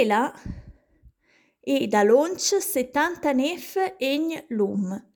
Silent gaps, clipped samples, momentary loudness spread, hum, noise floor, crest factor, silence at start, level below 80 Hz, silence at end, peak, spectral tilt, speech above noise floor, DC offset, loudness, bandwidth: none; under 0.1%; 10 LU; none; -64 dBFS; 16 dB; 0 s; -52 dBFS; 0.15 s; -8 dBFS; -4 dB/octave; 41 dB; under 0.1%; -24 LUFS; 19 kHz